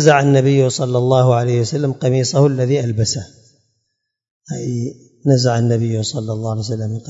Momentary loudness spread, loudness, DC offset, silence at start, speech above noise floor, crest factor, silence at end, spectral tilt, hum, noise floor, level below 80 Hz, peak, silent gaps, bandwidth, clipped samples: 10 LU; -16 LUFS; under 0.1%; 0 s; 58 dB; 16 dB; 0 s; -6 dB/octave; none; -74 dBFS; -56 dBFS; 0 dBFS; 4.31-4.41 s; 8 kHz; under 0.1%